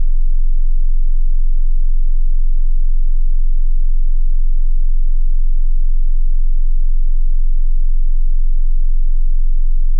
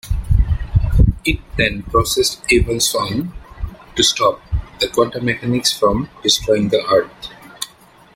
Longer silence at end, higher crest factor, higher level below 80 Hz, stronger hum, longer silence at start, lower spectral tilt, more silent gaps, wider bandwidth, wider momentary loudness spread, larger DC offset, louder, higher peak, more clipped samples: second, 0 s vs 0.5 s; second, 4 dB vs 16 dB; first, -10 dBFS vs -24 dBFS; neither; about the same, 0 s vs 0.05 s; first, -10 dB/octave vs -4 dB/octave; neither; second, 0.1 kHz vs 16.5 kHz; second, 0 LU vs 15 LU; neither; second, -22 LUFS vs -17 LUFS; second, -6 dBFS vs -2 dBFS; neither